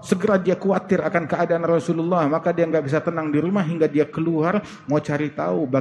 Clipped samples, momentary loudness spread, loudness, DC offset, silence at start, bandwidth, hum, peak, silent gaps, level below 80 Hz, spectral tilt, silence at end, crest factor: under 0.1%; 4 LU; -21 LUFS; under 0.1%; 0 s; 12 kHz; none; -4 dBFS; none; -60 dBFS; -7.5 dB/octave; 0 s; 18 dB